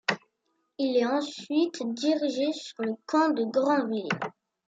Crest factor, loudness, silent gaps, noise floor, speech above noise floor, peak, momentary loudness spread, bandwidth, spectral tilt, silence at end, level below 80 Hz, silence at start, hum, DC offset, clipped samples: 18 dB; -28 LUFS; none; -76 dBFS; 49 dB; -10 dBFS; 8 LU; 8 kHz; -4.5 dB/octave; 0.4 s; -80 dBFS; 0.1 s; none; under 0.1%; under 0.1%